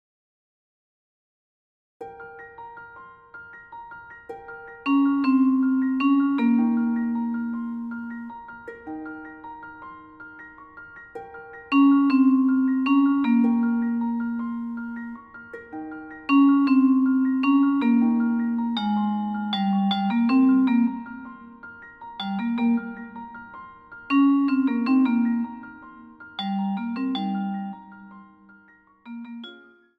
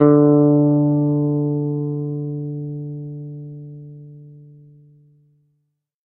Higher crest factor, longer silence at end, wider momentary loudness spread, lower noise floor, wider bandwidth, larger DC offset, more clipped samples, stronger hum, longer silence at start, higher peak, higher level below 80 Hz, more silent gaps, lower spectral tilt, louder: second, 14 dB vs 20 dB; second, 0.45 s vs 1.65 s; about the same, 23 LU vs 23 LU; second, -55 dBFS vs -72 dBFS; first, 4.9 kHz vs 2.2 kHz; neither; neither; neither; first, 2 s vs 0 s; second, -8 dBFS vs 0 dBFS; about the same, -66 dBFS vs -62 dBFS; neither; second, -8 dB/octave vs -15 dB/octave; second, -22 LUFS vs -18 LUFS